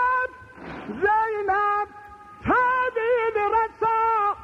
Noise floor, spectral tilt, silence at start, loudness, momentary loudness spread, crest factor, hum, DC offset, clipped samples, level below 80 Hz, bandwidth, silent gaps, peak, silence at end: -44 dBFS; -6.5 dB/octave; 0 s; -23 LUFS; 13 LU; 12 dB; none; under 0.1%; under 0.1%; -52 dBFS; 8.4 kHz; none; -10 dBFS; 0 s